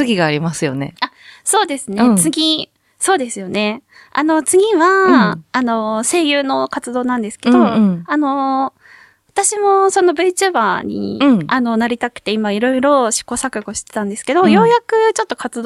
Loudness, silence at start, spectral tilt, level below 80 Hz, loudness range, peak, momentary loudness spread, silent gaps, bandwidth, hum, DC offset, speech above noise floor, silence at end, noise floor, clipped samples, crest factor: -15 LUFS; 0 s; -4 dB/octave; -56 dBFS; 2 LU; 0 dBFS; 10 LU; none; 14.5 kHz; none; under 0.1%; 31 dB; 0 s; -46 dBFS; under 0.1%; 14 dB